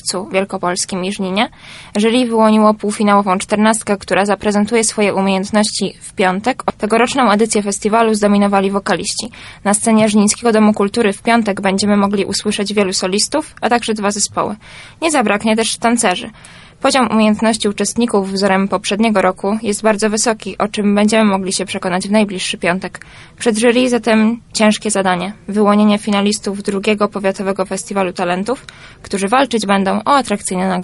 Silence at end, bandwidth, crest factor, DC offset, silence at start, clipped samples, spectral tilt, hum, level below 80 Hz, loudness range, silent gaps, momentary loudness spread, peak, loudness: 0 s; 11.5 kHz; 14 dB; under 0.1%; 0.05 s; under 0.1%; -4 dB/octave; none; -48 dBFS; 3 LU; none; 7 LU; 0 dBFS; -15 LUFS